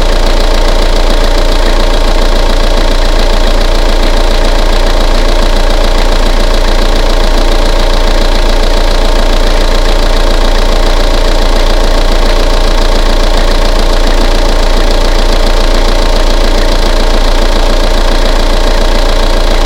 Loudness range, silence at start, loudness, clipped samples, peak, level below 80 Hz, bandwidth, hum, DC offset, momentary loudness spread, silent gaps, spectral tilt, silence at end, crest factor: 0 LU; 0 s; -11 LUFS; 2%; 0 dBFS; -6 dBFS; 12.5 kHz; none; under 0.1%; 0 LU; none; -4.5 dB/octave; 0 s; 6 dB